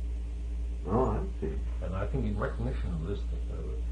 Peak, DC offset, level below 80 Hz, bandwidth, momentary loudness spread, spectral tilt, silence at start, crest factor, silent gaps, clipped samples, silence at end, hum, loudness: -14 dBFS; under 0.1%; -34 dBFS; 7.2 kHz; 8 LU; -8.5 dB/octave; 0 s; 18 dB; none; under 0.1%; 0 s; none; -34 LUFS